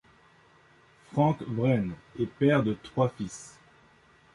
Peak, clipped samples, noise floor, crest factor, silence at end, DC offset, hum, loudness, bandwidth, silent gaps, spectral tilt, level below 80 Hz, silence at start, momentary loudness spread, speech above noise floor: -12 dBFS; under 0.1%; -60 dBFS; 18 dB; 0.85 s; under 0.1%; none; -28 LUFS; 11.5 kHz; none; -7.5 dB/octave; -60 dBFS; 1.15 s; 14 LU; 32 dB